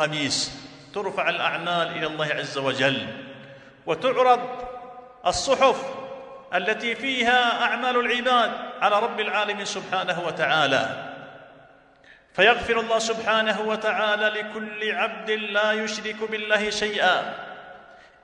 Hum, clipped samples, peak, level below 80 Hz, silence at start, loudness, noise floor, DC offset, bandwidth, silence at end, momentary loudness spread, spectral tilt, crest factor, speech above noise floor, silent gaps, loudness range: none; under 0.1%; -6 dBFS; -58 dBFS; 0 s; -23 LUFS; -53 dBFS; under 0.1%; 11 kHz; 0.25 s; 16 LU; -3 dB/octave; 20 dB; 30 dB; none; 3 LU